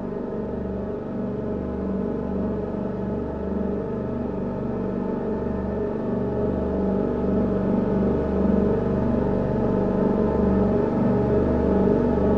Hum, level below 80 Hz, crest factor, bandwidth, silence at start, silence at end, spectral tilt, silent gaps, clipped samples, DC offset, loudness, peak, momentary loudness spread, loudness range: none; -36 dBFS; 16 dB; 5.6 kHz; 0 s; 0 s; -11 dB/octave; none; under 0.1%; under 0.1%; -24 LUFS; -8 dBFS; 7 LU; 6 LU